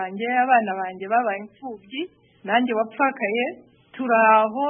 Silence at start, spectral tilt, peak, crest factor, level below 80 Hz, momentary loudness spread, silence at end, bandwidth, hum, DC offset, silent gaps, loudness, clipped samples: 0 s; -9 dB/octave; -4 dBFS; 18 dB; -76 dBFS; 16 LU; 0 s; 3.7 kHz; none; under 0.1%; none; -21 LUFS; under 0.1%